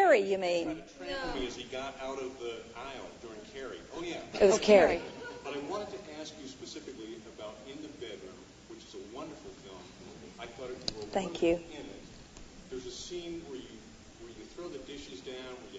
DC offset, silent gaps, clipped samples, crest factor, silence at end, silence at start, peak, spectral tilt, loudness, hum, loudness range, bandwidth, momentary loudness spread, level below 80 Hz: under 0.1%; none; under 0.1%; 26 dB; 0 s; 0 s; -10 dBFS; -4 dB/octave; -33 LUFS; none; 16 LU; 10 kHz; 22 LU; -58 dBFS